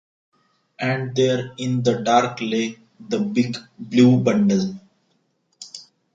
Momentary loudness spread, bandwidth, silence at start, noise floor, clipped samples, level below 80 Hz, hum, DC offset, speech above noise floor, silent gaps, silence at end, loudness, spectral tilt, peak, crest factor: 22 LU; 7.8 kHz; 0.8 s; -67 dBFS; under 0.1%; -62 dBFS; none; under 0.1%; 48 dB; none; 0.35 s; -20 LUFS; -6 dB/octave; -4 dBFS; 18 dB